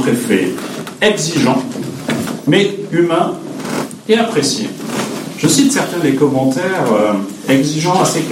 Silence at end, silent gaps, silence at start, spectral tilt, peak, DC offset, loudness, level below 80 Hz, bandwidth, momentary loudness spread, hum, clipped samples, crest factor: 0 s; none; 0 s; -4.5 dB/octave; 0 dBFS; under 0.1%; -15 LUFS; -56 dBFS; 16.5 kHz; 9 LU; none; under 0.1%; 14 dB